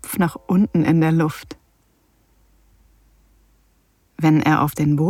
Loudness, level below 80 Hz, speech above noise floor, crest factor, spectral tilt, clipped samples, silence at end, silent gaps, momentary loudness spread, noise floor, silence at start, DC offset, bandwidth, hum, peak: -18 LUFS; -50 dBFS; 43 dB; 16 dB; -7 dB/octave; under 0.1%; 0 s; none; 8 LU; -61 dBFS; 0.05 s; under 0.1%; 16.5 kHz; none; -4 dBFS